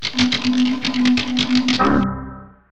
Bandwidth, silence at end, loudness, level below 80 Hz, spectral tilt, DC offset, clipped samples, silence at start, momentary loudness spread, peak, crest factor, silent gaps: 8.6 kHz; 0 s; -18 LUFS; -40 dBFS; -4 dB/octave; under 0.1%; under 0.1%; 0 s; 8 LU; -4 dBFS; 14 dB; none